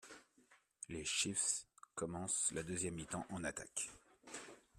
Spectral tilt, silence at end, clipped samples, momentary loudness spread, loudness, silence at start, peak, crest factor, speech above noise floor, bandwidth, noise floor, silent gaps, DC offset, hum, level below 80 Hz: -2 dB/octave; 0.2 s; under 0.1%; 16 LU; -41 LUFS; 0 s; -24 dBFS; 22 dB; 30 dB; 15 kHz; -72 dBFS; none; under 0.1%; none; -70 dBFS